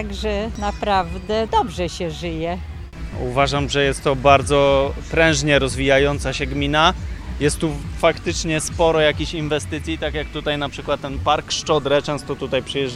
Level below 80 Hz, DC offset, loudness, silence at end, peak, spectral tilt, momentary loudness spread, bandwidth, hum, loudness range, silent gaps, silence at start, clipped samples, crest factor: -32 dBFS; under 0.1%; -20 LUFS; 0 s; 0 dBFS; -4.5 dB/octave; 10 LU; 13.5 kHz; none; 5 LU; none; 0 s; under 0.1%; 20 dB